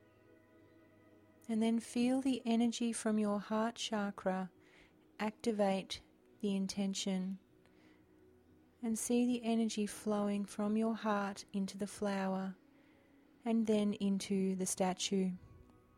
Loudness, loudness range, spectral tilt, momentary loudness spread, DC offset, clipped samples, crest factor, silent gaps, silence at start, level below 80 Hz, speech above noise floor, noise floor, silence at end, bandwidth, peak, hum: -37 LUFS; 3 LU; -5 dB/octave; 8 LU; under 0.1%; under 0.1%; 16 dB; none; 1.5 s; -74 dBFS; 30 dB; -66 dBFS; 0.4 s; 15.5 kHz; -22 dBFS; none